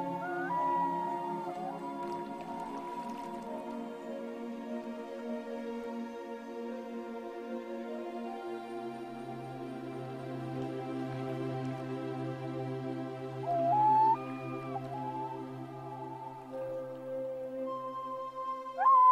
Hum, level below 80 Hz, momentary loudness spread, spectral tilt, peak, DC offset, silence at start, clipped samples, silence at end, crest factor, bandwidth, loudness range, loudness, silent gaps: none; -74 dBFS; 12 LU; -7.5 dB/octave; -16 dBFS; under 0.1%; 0 s; under 0.1%; 0 s; 20 dB; 15.5 kHz; 9 LU; -36 LUFS; none